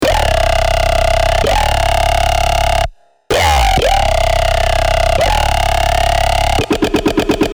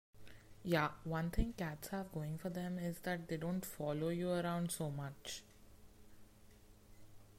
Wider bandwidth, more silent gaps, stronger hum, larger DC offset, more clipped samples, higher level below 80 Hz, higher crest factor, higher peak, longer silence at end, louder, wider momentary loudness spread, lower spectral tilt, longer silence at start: first, over 20 kHz vs 16 kHz; neither; neither; neither; neither; first, -18 dBFS vs -54 dBFS; second, 10 dB vs 20 dB; first, -2 dBFS vs -22 dBFS; about the same, 0.05 s vs 0 s; first, -13 LUFS vs -41 LUFS; second, 2 LU vs 10 LU; second, -4 dB/octave vs -5.5 dB/octave; second, 0 s vs 0.15 s